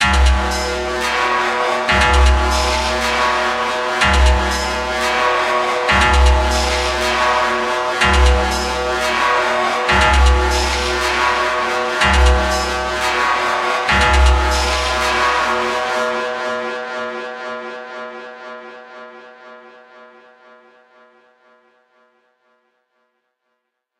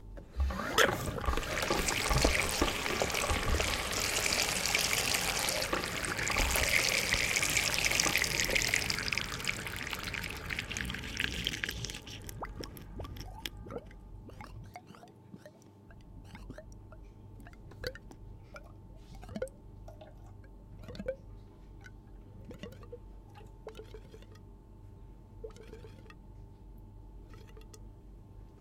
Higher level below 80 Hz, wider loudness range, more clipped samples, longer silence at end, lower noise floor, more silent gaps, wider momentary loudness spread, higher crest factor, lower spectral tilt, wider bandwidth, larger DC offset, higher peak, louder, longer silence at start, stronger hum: first, -22 dBFS vs -44 dBFS; second, 11 LU vs 23 LU; neither; first, 3.95 s vs 0 s; first, -73 dBFS vs -55 dBFS; neither; second, 13 LU vs 25 LU; second, 16 dB vs 30 dB; first, -4 dB/octave vs -2 dB/octave; second, 13.5 kHz vs 17 kHz; neither; first, 0 dBFS vs -6 dBFS; first, -16 LUFS vs -31 LUFS; about the same, 0 s vs 0 s; neither